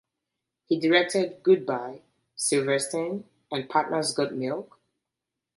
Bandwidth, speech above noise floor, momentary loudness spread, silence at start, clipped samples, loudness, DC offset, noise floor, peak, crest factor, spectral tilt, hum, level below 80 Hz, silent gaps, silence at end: 12 kHz; 61 dB; 13 LU; 0.7 s; under 0.1%; -26 LUFS; under 0.1%; -86 dBFS; -8 dBFS; 20 dB; -3.5 dB/octave; none; -74 dBFS; none; 0.95 s